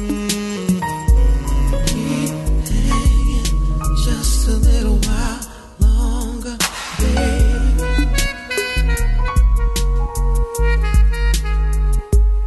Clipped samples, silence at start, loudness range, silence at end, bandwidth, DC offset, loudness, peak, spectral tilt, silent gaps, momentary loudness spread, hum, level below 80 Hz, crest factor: under 0.1%; 0 s; 1 LU; 0 s; 12.5 kHz; under 0.1%; -18 LUFS; -4 dBFS; -5 dB/octave; none; 4 LU; none; -16 dBFS; 12 dB